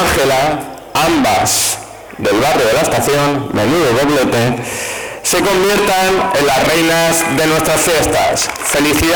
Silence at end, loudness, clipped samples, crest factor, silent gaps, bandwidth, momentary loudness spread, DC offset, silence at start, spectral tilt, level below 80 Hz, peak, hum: 0 s; -13 LUFS; under 0.1%; 6 dB; none; over 20 kHz; 7 LU; 0.4%; 0 s; -3.5 dB/octave; -36 dBFS; -8 dBFS; none